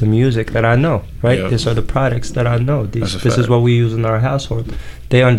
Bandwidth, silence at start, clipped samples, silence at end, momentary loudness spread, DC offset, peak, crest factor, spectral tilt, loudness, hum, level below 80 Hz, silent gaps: 11.5 kHz; 0 s; under 0.1%; 0 s; 7 LU; 0.8%; -2 dBFS; 12 dB; -7 dB/octave; -16 LUFS; none; -30 dBFS; none